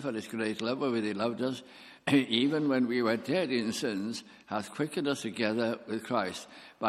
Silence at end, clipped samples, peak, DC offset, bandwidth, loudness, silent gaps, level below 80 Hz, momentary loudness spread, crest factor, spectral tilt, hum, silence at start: 0 s; under 0.1%; -12 dBFS; under 0.1%; 14.5 kHz; -31 LUFS; none; -74 dBFS; 10 LU; 20 dB; -5 dB/octave; none; 0 s